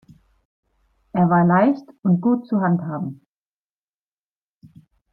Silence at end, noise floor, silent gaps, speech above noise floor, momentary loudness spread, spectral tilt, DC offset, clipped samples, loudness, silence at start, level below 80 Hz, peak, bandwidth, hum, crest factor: 2 s; under -90 dBFS; none; over 72 dB; 13 LU; -11.5 dB/octave; under 0.1%; under 0.1%; -19 LUFS; 1.15 s; -62 dBFS; -6 dBFS; 4.2 kHz; 50 Hz at -50 dBFS; 16 dB